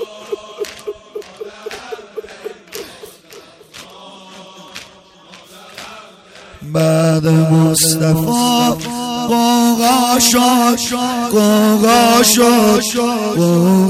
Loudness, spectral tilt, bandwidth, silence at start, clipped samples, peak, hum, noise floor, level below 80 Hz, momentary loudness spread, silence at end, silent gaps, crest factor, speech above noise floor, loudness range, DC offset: -12 LUFS; -4.5 dB/octave; 16 kHz; 0 s; under 0.1%; -2 dBFS; none; -42 dBFS; -48 dBFS; 22 LU; 0 s; none; 14 dB; 30 dB; 22 LU; under 0.1%